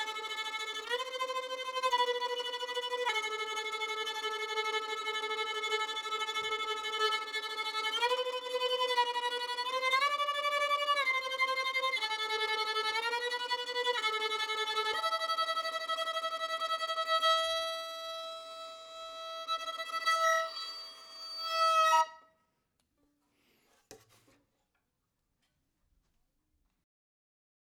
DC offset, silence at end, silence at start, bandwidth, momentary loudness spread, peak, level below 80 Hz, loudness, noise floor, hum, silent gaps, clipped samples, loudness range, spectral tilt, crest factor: under 0.1%; 3.8 s; 0 s; over 20 kHz; 9 LU; -16 dBFS; -82 dBFS; -32 LUFS; -82 dBFS; none; none; under 0.1%; 3 LU; 2 dB/octave; 18 dB